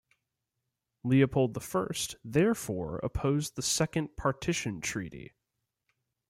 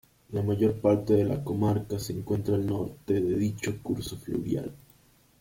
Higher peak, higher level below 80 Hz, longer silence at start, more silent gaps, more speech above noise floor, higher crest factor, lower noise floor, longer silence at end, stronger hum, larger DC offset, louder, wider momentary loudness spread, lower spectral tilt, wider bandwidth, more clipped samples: about the same, -12 dBFS vs -12 dBFS; about the same, -52 dBFS vs -54 dBFS; first, 1.05 s vs 0.3 s; neither; first, 55 dB vs 33 dB; about the same, 20 dB vs 18 dB; first, -85 dBFS vs -61 dBFS; first, 1.05 s vs 0.65 s; neither; neither; about the same, -30 LUFS vs -29 LUFS; about the same, 9 LU vs 9 LU; second, -5 dB/octave vs -7.5 dB/octave; about the same, 16.5 kHz vs 16.5 kHz; neither